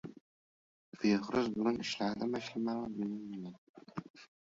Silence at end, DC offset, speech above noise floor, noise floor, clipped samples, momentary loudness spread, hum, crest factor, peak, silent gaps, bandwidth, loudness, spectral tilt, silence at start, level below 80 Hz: 0.15 s; under 0.1%; over 55 dB; under -90 dBFS; under 0.1%; 16 LU; none; 20 dB; -18 dBFS; 0.21-0.92 s, 3.58-3.74 s, 4.10-4.14 s; 7.6 kHz; -36 LUFS; -4.5 dB/octave; 0.05 s; -72 dBFS